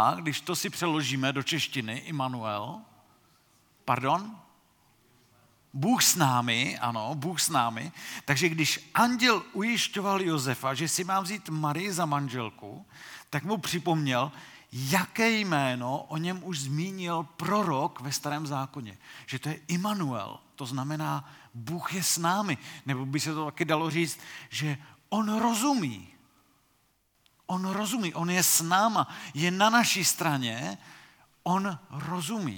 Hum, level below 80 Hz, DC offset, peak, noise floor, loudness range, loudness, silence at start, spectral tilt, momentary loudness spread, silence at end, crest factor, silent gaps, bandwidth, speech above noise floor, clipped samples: none; -76 dBFS; under 0.1%; -8 dBFS; -70 dBFS; 7 LU; -28 LUFS; 0 s; -3.5 dB/octave; 14 LU; 0 s; 22 dB; none; 19 kHz; 41 dB; under 0.1%